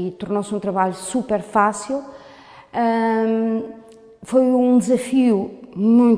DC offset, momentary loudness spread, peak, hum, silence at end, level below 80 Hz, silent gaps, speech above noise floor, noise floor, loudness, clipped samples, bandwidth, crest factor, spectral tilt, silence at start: under 0.1%; 11 LU; -2 dBFS; none; 0 s; -60 dBFS; none; 25 dB; -43 dBFS; -19 LUFS; under 0.1%; 11 kHz; 16 dB; -6 dB/octave; 0 s